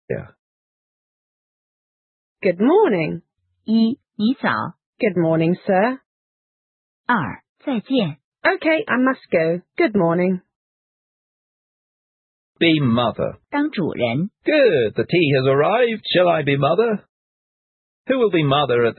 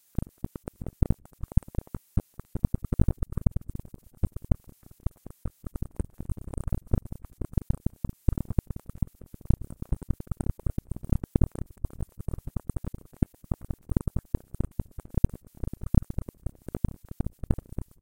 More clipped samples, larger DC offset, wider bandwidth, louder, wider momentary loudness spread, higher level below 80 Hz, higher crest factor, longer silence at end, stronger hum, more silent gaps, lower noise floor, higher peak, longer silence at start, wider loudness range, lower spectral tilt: neither; second, under 0.1% vs 0.2%; second, 4.4 kHz vs 16.5 kHz; first, -19 LUFS vs -33 LUFS; about the same, 11 LU vs 12 LU; second, -60 dBFS vs -34 dBFS; second, 16 dB vs 28 dB; second, 0.05 s vs 1.25 s; neither; first, 0.39-2.36 s, 4.86-4.93 s, 6.06-7.04 s, 7.49-7.56 s, 8.24-8.32 s, 10.56-12.55 s, 17.09-18.05 s vs none; first, under -90 dBFS vs -53 dBFS; about the same, -4 dBFS vs -2 dBFS; second, 0.1 s vs 2.15 s; about the same, 5 LU vs 4 LU; first, -11.5 dB/octave vs -9.5 dB/octave